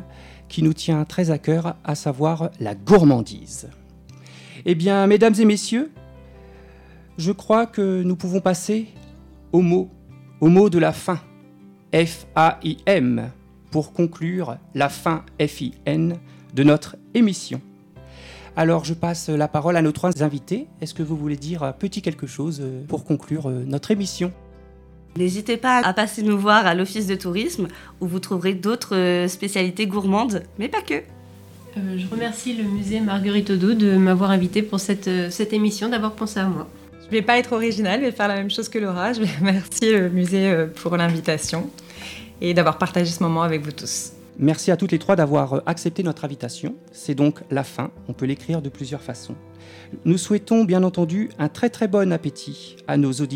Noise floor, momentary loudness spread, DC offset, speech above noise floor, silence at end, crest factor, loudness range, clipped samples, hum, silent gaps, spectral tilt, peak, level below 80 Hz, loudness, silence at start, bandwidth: -47 dBFS; 13 LU; under 0.1%; 27 dB; 0 s; 20 dB; 5 LU; under 0.1%; none; none; -6 dB/octave; -2 dBFS; -52 dBFS; -21 LUFS; 0 s; 16 kHz